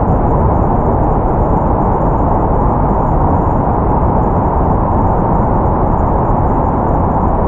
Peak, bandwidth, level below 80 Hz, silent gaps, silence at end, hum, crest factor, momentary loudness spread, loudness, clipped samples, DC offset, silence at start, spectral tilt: 0 dBFS; 3.1 kHz; -18 dBFS; none; 0 s; none; 10 dB; 1 LU; -13 LUFS; under 0.1%; under 0.1%; 0 s; -12 dB/octave